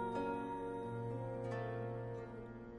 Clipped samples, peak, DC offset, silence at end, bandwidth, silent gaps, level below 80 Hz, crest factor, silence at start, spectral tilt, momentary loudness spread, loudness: under 0.1%; -28 dBFS; under 0.1%; 0 s; 10.5 kHz; none; -64 dBFS; 14 dB; 0 s; -8.5 dB/octave; 7 LU; -44 LUFS